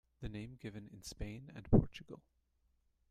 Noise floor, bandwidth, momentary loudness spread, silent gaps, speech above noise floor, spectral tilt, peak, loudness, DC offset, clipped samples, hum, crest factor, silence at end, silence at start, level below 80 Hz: -78 dBFS; 14 kHz; 20 LU; none; 40 dB; -7.5 dB/octave; -16 dBFS; -38 LUFS; under 0.1%; under 0.1%; none; 24 dB; 0.95 s; 0.2 s; -48 dBFS